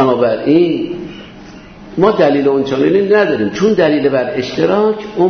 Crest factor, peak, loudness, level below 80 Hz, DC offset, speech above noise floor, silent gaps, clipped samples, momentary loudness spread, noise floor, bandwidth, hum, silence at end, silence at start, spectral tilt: 12 dB; 0 dBFS; -13 LUFS; -46 dBFS; under 0.1%; 22 dB; none; under 0.1%; 11 LU; -34 dBFS; 6.6 kHz; none; 0 s; 0 s; -7 dB/octave